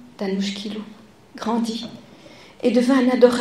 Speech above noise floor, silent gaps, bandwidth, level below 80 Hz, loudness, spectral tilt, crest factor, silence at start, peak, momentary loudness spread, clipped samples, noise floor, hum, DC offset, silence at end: 26 dB; none; 13 kHz; -64 dBFS; -21 LUFS; -5.5 dB/octave; 20 dB; 0.05 s; -2 dBFS; 17 LU; under 0.1%; -45 dBFS; none; 0.1%; 0 s